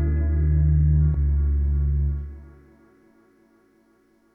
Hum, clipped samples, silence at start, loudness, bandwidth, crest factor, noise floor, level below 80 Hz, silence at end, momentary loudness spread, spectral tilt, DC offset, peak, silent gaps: none; under 0.1%; 0 s; -22 LUFS; 2.1 kHz; 12 dB; -61 dBFS; -26 dBFS; 1.9 s; 8 LU; -13 dB/octave; under 0.1%; -12 dBFS; none